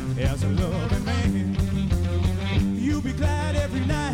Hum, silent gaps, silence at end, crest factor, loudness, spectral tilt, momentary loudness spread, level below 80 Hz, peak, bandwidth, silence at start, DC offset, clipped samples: none; none; 0 s; 10 dB; -25 LUFS; -6.5 dB/octave; 1 LU; -30 dBFS; -14 dBFS; 15 kHz; 0 s; under 0.1%; under 0.1%